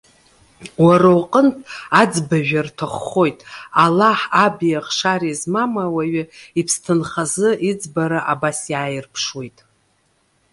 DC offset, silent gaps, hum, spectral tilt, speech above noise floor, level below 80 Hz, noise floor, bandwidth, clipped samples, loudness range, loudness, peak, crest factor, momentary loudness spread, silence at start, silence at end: under 0.1%; none; none; -5 dB/octave; 45 dB; -58 dBFS; -62 dBFS; 11.5 kHz; under 0.1%; 4 LU; -17 LUFS; 0 dBFS; 18 dB; 11 LU; 0.6 s; 1.05 s